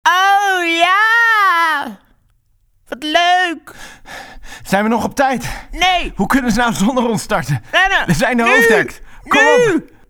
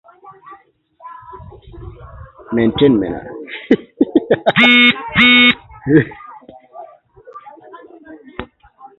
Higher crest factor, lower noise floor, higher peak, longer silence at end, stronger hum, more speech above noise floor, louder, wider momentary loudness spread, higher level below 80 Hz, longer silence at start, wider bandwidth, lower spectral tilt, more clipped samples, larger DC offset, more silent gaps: about the same, 14 dB vs 16 dB; first, -57 dBFS vs -48 dBFS; about the same, 0 dBFS vs 0 dBFS; second, 0.25 s vs 0.55 s; neither; first, 43 dB vs 37 dB; about the same, -13 LUFS vs -12 LUFS; second, 18 LU vs 25 LU; first, -36 dBFS vs -44 dBFS; second, 0.05 s vs 0.25 s; first, over 20 kHz vs 7.2 kHz; second, -4 dB/octave vs -6.5 dB/octave; neither; neither; neither